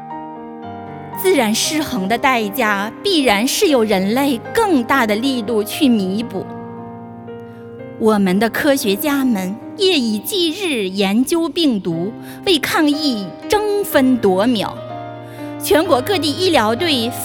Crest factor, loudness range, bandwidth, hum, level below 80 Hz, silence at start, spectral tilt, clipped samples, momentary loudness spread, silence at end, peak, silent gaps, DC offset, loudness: 16 dB; 3 LU; over 20 kHz; none; -50 dBFS; 0 s; -4 dB/octave; under 0.1%; 17 LU; 0 s; 0 dBFS; none; under 0.1%; -16 LUFS